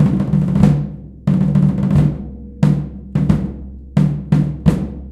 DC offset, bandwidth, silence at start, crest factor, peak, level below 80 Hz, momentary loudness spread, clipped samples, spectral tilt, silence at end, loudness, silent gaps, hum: under 0.1%; 8.4 kHz; 0 s; 16 dB; 0 dBFS; -30 dBFS; 11 LU; under 0.1%; -9.5 dB/octave; 0 s; -16 LUFS; none; none